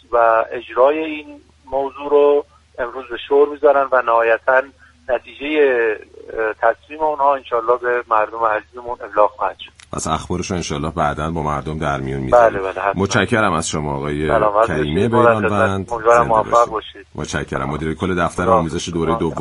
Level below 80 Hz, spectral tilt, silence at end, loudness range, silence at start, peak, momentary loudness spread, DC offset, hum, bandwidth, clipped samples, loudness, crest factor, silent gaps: -40 dBFS; -5.5 dB/octave; 0 s; 4 LU; 0.1 s; 0 dBFS; 12 LU; under 0.1%; none; 11.5 kHz; under 0.1%; -17 LUFS; 18 dB; none